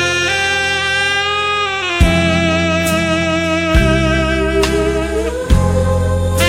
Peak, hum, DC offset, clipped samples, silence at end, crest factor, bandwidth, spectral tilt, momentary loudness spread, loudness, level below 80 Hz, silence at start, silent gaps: 0 dBFS; none; under 0.1%; under 0.1%; 0 s; 14 dB; 16.5 kHz; -4.5 dB/octave; 3 LU; -14 LUFS; -22 dBFS; 0 s; none